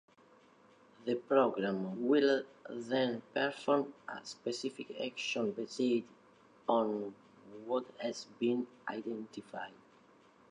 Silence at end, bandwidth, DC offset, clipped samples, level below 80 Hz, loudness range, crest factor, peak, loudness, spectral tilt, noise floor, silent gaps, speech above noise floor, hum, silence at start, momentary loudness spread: 0.8 s; 10.5 kHz; under 0.1%; under 0.1%; -86 dBFS; 5 LU; 22 dB; -16 dBFS; -36 LUFS; -5 dB/octave; -64 dBFS; none; 29 dB; none; 1 s; 16 LU